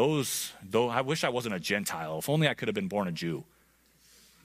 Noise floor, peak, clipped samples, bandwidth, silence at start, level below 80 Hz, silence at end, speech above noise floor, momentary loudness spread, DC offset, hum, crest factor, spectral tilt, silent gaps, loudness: -65 dBFS; -10 dBFS; under 0.1%; 15.5 kHz; 0 s; -68 dBFS; 1.05 s; 35 dB; 7 LU; under 0.1%; none; 20 dB; -4.5 dB/octave; none; -30 LUFS